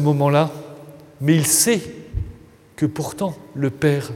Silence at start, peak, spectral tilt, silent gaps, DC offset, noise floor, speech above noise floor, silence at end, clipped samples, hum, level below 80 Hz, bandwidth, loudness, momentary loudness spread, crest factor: 0 s; -2 dBFS; -4.5 dB/octave; none; under 0.1%; -43 dBFS; 24 dB; 0 s; under 0.1%; none; -42 dBFS; 16.5 kHz; -20 LUFS; 18 LU; 18 dB